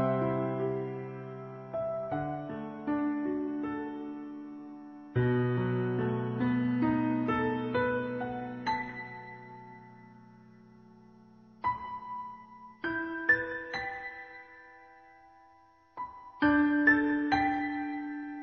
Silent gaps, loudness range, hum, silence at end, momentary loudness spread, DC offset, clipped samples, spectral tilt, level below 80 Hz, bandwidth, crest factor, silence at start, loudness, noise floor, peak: none; 11 LU; none; 0 s; 19 LU; under 0.1%; under 0.1%; -5.5 dB/octave; -62 dBFS; 6.6 kHz; 20 dB; 0 s; -31 LUFS; -61 dBFS; -12 dBFS